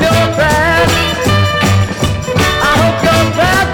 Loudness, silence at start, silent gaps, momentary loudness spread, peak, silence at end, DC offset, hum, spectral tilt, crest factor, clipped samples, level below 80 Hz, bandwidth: -11 LUFS; 0 s; none; 3 LU; 0 dBFS; 0 s; 0.2%; none; -4.5 dB/octave; 10 dB; under 0.1%; -26 dBFS; 19 kHz